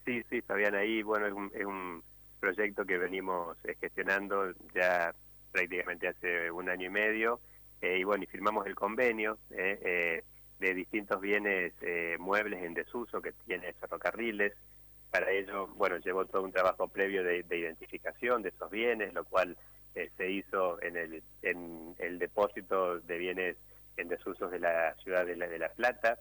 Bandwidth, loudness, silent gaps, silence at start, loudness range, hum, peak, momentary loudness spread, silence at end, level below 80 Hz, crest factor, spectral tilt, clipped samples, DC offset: over 20 kHz; -34 LUFS; none; 0 s; 3 LU; none; -18 dBFS; 10 LU; 0 s; -66 dBFS; 16 dB; -5 dB/octave; under 0.1%; under 0.1%